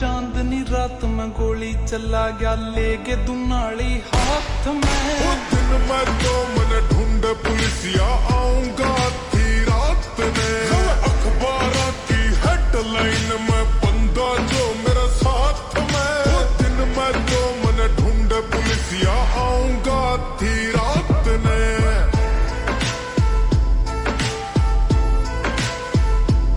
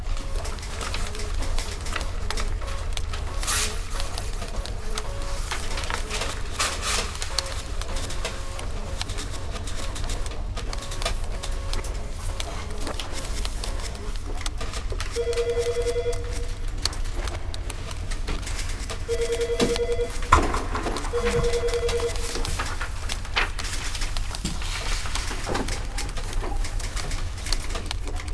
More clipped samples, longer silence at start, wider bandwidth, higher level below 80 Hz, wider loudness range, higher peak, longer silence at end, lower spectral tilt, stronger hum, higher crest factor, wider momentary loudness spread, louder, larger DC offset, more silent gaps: neither; about the same, 0 s vs 0 s; about the same, 11.5 kHz vs 11 kHz; first, -20 dBFS vs -30 dBFS; second, 2 LU vs 7 LU; second, -6 dBFS vs 0 dBFS; about the same, 0 s vs 0 s; first, -5 dB/octave vs -3.5 dB/octave; neither; second, 12 dB vs 26 dB; second, 4 LU vs 8 LU; first, -20 LUFS vs -29 LUFS; second, under 0.1% vs 0.3%; neither